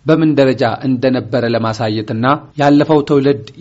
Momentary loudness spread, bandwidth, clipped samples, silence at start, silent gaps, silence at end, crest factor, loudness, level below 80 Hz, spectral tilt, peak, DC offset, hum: 5 LU; 8 kHz; under 0.1%; 0.05 s; none; 0 s; 14 dB; -14 LUFS; -50 dBFS; -6 dB/octave; 0 dBFS; under 0.1%; none